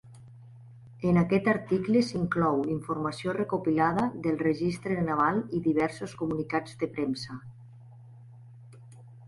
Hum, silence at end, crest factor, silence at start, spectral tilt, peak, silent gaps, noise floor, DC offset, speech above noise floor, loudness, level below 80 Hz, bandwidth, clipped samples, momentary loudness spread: none; 0 s; 18 dB; 0.05 s; -7.5 dB/octave; -10 dBFS; none; -50 dBFS; under 0.1%; 22 dB; -28 LUFS; -58 dBFS; 11.5 kHz; under 0.1%; 7 LU